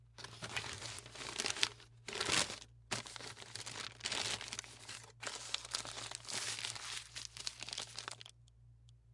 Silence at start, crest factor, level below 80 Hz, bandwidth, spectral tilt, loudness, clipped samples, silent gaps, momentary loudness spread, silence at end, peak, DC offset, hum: 0 s; 34 dB; -68 dBFS; 11.5 kHz; -1 dB/octave; -41 LUFS; under 0.1%; none; 13 LU; 0 s; -10 dBFS; under 0.1%; none